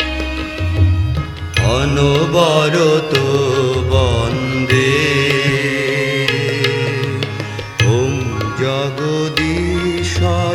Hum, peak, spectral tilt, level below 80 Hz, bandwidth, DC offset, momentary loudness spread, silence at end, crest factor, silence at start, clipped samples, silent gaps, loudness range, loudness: none; 0 dBFS; -5.5 dB/octave; -30 dBFS; 15.5 kHz; under 0.1%; 7 LU; 0 s; 16 dB; 0 s; under 0.1%; none; 3 LU; -15 LUFS